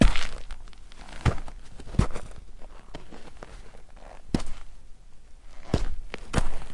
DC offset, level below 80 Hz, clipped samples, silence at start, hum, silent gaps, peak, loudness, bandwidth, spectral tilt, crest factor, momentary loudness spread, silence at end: 0.3%; -32 dBFS; under 0.1%; 0 s; none; none; -4 dBFS; -31 LUFS; 11 kHz; -6 dB/octave; 22 dB; 21 LU; 0 s